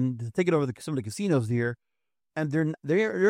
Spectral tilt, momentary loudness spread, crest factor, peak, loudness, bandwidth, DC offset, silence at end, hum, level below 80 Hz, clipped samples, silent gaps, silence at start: -7 dB/octave; 7 LU; 16 dB; -10 dBFS; -28 LUFS; 15.5 kHz; under 0.1%; 0 s; none; -68 dBFS; under 0.1%; none; 0 s